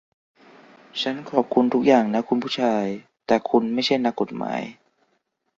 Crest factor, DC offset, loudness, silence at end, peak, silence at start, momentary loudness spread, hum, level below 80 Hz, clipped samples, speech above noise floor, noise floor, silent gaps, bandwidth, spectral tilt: 22 dB; under 0.1%; -22 LUFS; 0.9 s; -2 dBFS; 0.95 s; 12 LU; none; -64 dBFS; under 0.1%; 50 dB; -71 dBFS; none; 7.6 kHz; -5.5 dB/octave